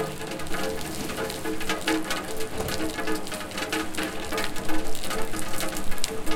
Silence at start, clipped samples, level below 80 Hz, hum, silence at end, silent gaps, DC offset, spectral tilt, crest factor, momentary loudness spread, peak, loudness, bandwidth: 0 s; under 0.1%; -38 dBFS; none; 0 s; none; under 0.1%; -3 dB/octave; 20 dB; 4 LU; -4 dBFS; -30 LUFS; 17 kHz